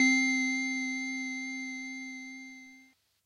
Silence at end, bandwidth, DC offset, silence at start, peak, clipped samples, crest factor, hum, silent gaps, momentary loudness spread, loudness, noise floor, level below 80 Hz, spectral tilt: 0.45 s; 11 kHz; under 0.1%; 0 s; -14 dBFS; under 0.1%; 18 dB; none; none; 19 LU; -31 LUFS; -62 dBFS; -88 dBFS; 0.5 dB/octave